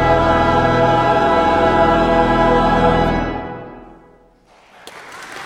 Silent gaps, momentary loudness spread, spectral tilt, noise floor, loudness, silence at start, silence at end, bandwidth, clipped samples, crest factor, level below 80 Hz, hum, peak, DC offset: none; 17 LU; -6.5 dB/octave; -50 dBFS; -14 LUFS; 0 s; 0 s; 12.5 kHz; under 0.1%; 14 dB; -30 dBFS; none; 0 dBFS; under 0.1%